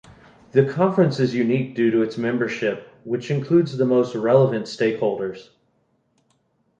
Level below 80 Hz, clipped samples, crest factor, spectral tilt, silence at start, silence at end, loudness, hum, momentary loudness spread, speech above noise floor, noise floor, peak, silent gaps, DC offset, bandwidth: -64 dBFS; under 0.1%; 18 dB; -7.5 dB/octave; 0.55 s; 1.4 s; -21 LUFS; none; 10 LU; 46 dB; -66 dBFS; -4 dBFS; none; under 0.1%; 8.4 kHz